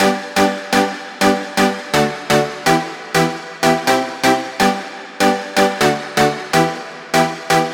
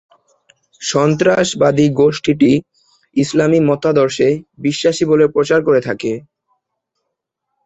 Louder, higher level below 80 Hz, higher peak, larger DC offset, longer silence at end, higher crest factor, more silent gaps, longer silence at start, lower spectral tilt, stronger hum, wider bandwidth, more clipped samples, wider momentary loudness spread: about the same, -16 LUFS vs -14 LUFS; about the same, -50 dBFS vs -52 dBFS; about the same, -2 dBFS vs -2 dBFS; neither; second, 0 s vs 1.45 s; about the same, 16 dB vs 14 dB; neither; second, 0 s vs 0.8 s; second, -4 dB/octave vs -5.5 dB/octave; neither; first, 19.5 kHz vs 8.2 kHz; neither; second, 3 LU vs 8 LU